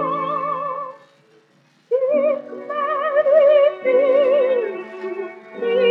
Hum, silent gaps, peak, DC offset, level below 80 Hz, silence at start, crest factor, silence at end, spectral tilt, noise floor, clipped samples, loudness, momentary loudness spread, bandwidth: none; none; -4 dBFS; under 0.1%; under -90 dBFS; 0 s; 14 dB; 0 s; -6.5 dB/octave; -57 dBFS; under 0.1%; -18 LUFS; 15 LU; 4.6 kHz